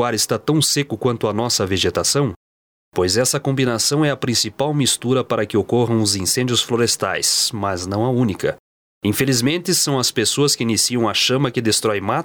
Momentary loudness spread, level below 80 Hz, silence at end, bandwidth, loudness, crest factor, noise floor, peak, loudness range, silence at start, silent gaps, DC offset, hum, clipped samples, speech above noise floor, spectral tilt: 5 LU; -54 dBFS; 0 s; over 20 kHz; -18 LUFS; 16 dB; under -90 dBFS; -4 dBFS; 2 LU; 0 s; 2.36-2.92 s, 8.60-9.01 s; under 0.1%; none; under 0.1%; over 72 dB; -3.5 dB/octave